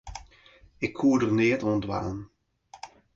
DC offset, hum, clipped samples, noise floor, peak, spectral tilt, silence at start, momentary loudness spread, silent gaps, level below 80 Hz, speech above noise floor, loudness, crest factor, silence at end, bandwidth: under 0.1%; none; under 0.1%; -56 dBFS; -12 dBFS; -6.5 dB/octave; 0.05 s; 23 LU; none; -52 dBFS; 31 dB; -26 LUFS; 16 dB; 0.3 s; 7.8 kHz